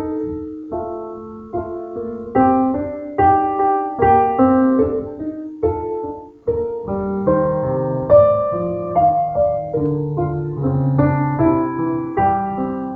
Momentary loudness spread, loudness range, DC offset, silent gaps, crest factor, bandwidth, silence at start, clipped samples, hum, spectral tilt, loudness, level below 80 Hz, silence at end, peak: 13 LU; 4 LU; under 0.1%; none; 18 dB; 3.8 kHz; 0 s; under 0.1%; none; -12 dB/octave; -18 LUFS; -42 dBFS; 0 s; 0 dBFS